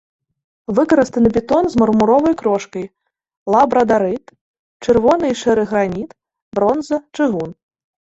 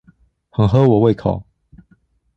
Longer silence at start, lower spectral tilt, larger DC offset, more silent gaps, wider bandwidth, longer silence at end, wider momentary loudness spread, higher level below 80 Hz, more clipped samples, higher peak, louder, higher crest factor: about the same, 0.7 s vs 0.6 s; second, -6.5 dB/octave vs -10 dB/octave; neither; first, 3.37-3.46 s, 4.41-4.80 s, 6.42-6.51 s vs none; first, 8 kHz vs 6.4 kHz; second, 0.6 s vs 0.95 s; about the same, 15 LU vs 14 LU; second, -46 dBFS vs -40 dBFS; neither; about the same, 0 dBFS vs -2 dBFS; about the same, -16 LUFS vs -16 LUFS; about the same, 16 dB vs 16 dB